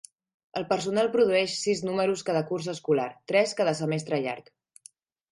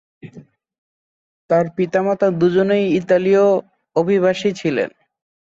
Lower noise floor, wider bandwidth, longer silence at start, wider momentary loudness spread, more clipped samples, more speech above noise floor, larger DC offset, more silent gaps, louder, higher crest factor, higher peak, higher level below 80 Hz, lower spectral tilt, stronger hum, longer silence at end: first, -56 dBFS vs -44 dBFS; first, 11.5 kHz vs 7.8 kHz; first, 0.55 s vs 0.25 s; about the same, 8 LU vs 7 LU; neither; about the same, 30 dB vs 28 dB; neither; second, none vs 0.78-1.49 s; second, -27 LUFS vs -17 LUFS; about the same, 18 dB vs 14 dB; second, -10 dBFS vs -4 dBFS; second, -72 dBFS vs -60 dBFS; second, -4.5 dB/octave vs -7 dB/octave; neither; first, 0.9 s vs 0.55 s